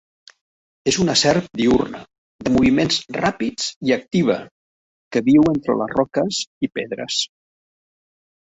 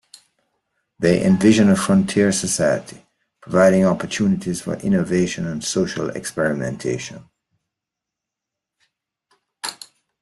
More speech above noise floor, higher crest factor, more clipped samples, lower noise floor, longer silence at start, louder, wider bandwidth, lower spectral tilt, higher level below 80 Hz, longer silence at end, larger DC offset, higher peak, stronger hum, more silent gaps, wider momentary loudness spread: first, over 71 dB vs 66 dB; about the same, 18 dB vs 18 dB; neither; first, under -90 dBFS vs -84 dBFS; second, 0.85 s vs 1 s; about the same, -19 LUFS vs -19 LUFS; second, 8.4 kHz vs 12.5 kHz; about the same, -4.5 dB/octave vs -5.5 dB/octave; first, -48 dBFS vs -54 dBFS; first, 1.3 s vs 0.5 s; neither; about the same, -2 dBFS vs -2 dBFS; neither; first, 2.18-2.39 s, 3.76-3.81 s, 4.51-5.11 s, 6.47-6.61 s vs none; second, 10 LU vs 13 LU